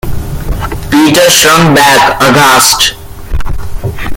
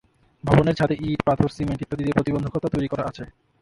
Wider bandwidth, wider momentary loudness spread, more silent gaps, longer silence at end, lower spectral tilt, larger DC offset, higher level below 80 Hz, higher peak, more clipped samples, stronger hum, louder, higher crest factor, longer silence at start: first, over 20 kHz vs 11.5 kHz; first, 16 LU vs 12 LU; neither; second, 0 s vs 0.3 s; second, -3 dB/octave vs -8 dB/octave; neither; first, -20 dBFS vs -44 dBFS; about the same, 0 dBFS vs 0 dBFS; first, 1% vs under 0.1%; neither; first, -5 LUFS vs -23 LUFS; second, 8 dB vs 22 dB; second, 0.05 s vs 0.45 s